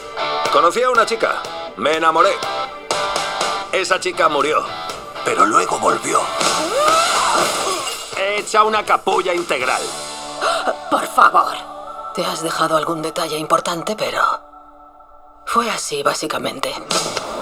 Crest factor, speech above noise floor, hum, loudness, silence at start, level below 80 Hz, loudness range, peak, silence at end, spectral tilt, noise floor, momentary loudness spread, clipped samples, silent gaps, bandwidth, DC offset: 18 dB; 26 dB; none; -18 LUFS; 0 s; -54 dBFS; 4 LU; 0 dBFS; 0 s; -2 dB/octave; -43 dBFS; 10 LU; under 0.1%; none; 17.5 kHz; under 0.1%